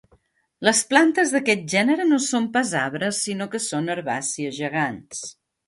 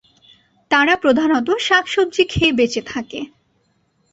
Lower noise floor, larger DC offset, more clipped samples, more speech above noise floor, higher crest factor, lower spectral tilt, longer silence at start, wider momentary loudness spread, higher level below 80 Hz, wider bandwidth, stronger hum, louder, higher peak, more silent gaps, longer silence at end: about the same, -62 dBFS vs -63 dBFS; neither; neither; second, 40 dB vs 47 dB; about the same, 20 dB vs 18 dB; about the same, -3 dB/octave vs -4 dB/octave; about the same, 0.6 s vs 0.7 s; second, 10 LU vs 13 LU; second, -66 dBFS vs -44 dBFS; first, 11.5 kHz vs 8.2 kHz; neither; second, -21 LUFS vs -16 LUFS; about the same, -2 dBFS vs -2 dBFS; neither; second, 0.35 s vs 0.85 s